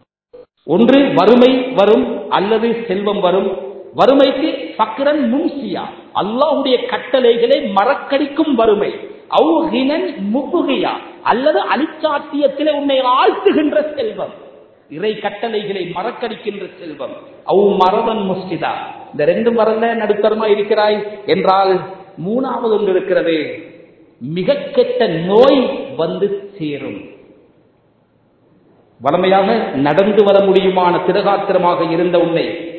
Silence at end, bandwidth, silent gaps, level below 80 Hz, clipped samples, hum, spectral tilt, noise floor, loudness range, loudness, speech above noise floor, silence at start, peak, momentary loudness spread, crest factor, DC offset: 0 s; 6.4 kHz; none; -56 dBFS; under 0.1%; none; -8 dB/octave; -55 dBFS; 6 LU; -15 LUFS; 41 dB; 0.35 s; 0 dBFS; 13 LU; 14 dB; under 0.1%